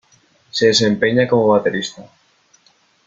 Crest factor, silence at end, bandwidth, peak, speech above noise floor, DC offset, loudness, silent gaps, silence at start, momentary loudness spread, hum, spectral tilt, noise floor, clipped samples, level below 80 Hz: 16 dB; 1.05 s; 9.2 kHz; -2 dBFS; 41 dB; under 0.1%; -15 LUFS; none; 0.55 s; 12 LU; none; -4.5 dB/octave; -57 dBFS; under 0.1%; -56 dBFS